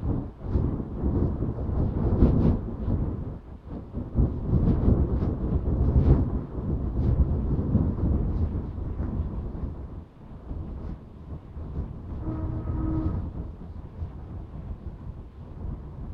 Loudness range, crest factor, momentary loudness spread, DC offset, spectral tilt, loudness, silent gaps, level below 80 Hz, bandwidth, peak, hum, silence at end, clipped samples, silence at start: 11 LU; 22 dB; 17 LU; under 0.1%; -12 dB/octave; -28 LUFS; none; -30 dBFS; 4 kHz; -4 dBFS; none; 0 s; under 0.1%; 0 s